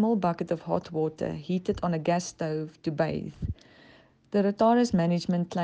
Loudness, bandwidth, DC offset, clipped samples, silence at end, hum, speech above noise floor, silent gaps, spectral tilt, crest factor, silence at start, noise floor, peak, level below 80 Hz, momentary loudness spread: -28 LUFS; 9.2 kHz; under 0.1%; under 0.1%; 0 s; none; 30 dB; none; -7 dB/octave; 16 dB; 0 s; -57 dBFS; -12 dBFS; -52 dBFS; 11 LU